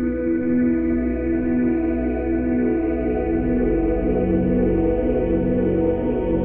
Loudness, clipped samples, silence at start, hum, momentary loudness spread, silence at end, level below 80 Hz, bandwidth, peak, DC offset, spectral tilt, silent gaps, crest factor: -21 LUFS; under 0.1%; 0 s; none; 3 LU; 0 s; -30 dBFS; 3.3 kHz; -10 dBFS; under 0.1%; -13 dB/octave; none; 10 dB